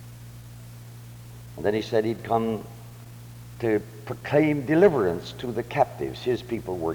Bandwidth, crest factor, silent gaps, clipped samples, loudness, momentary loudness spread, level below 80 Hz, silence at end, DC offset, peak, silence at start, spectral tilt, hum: over 20 kHz; 20 dB; none; under 0.1%; -25 LUFS; 23 LU; -54 dBFS; 0 s; under 0.1%; -8 dBFS; 0 s; -7 dB/octave; none